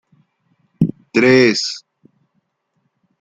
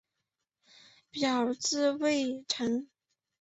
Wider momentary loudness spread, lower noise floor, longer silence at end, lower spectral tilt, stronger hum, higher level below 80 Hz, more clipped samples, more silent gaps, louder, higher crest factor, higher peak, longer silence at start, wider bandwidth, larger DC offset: first, 12 LU vs 5 LU; second, -69 dBFS vs -85 dBFS; first, 1.4 s vs 0.55 s; first, -5 dB/octave vs -2.5 dB/octave; neither; first, -56 dBFS vs -76 dBFS; neither; neither; first, -15 LUFS vs -30 LUFS; about the same, 18 dB vs 16 dB; first, -2 dBFS vs -16 dBFS; second, 0.8 s vs 1.15 s; first, 9.2 kHz vs 8.2 kHz; neither